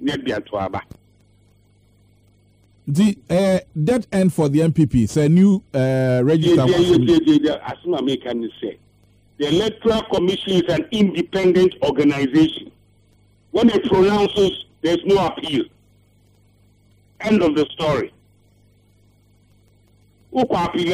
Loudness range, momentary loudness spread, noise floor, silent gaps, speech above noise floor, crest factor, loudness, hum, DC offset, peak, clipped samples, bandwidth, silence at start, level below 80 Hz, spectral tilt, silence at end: 8 LU; 11 LU; -55 dBFS; none; 38 dB; 16 dB; -18 LUFS; 50 Hz at -45 dBFS; under 0.1%; -4 dBFS; under 0.1%; 15 kHz; 0 s; -46 dBFS; -6.5 dB/octave; 0 s